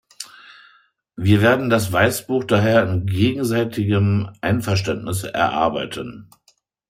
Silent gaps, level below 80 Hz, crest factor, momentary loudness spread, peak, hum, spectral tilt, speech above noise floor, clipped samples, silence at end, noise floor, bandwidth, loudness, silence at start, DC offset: none; -52 dBFS; 18 dB; 12 LU; -2 dBFS; none; -6 dB/octave; 43 dB; under 0.1%; 0.65 s; -61 dBFS; 16 kHz; -19 LUFS; 0.2 s; under 0.1%